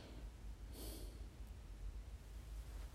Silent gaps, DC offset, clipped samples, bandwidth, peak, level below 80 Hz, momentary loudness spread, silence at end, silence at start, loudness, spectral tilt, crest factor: none; under 0.1%; under 0.1%; 16 kHz; -38 dBFS; -52 dBFS; 4 LU; 0 s; 0 s; -55 LUFS; -5 dB/octave; 12 dB